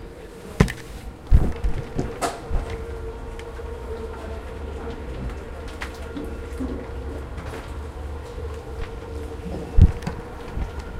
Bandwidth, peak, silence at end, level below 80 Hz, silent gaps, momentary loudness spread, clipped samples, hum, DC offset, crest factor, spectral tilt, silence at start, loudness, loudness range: 14.5 kHz; 0 dBFS; 0 s; -28 dBFS; none; 13 LU; under 0.1%; none; under 0.1%; 26 dB; -7 dB/octave; 0 s; -28 LUFS; 7 LU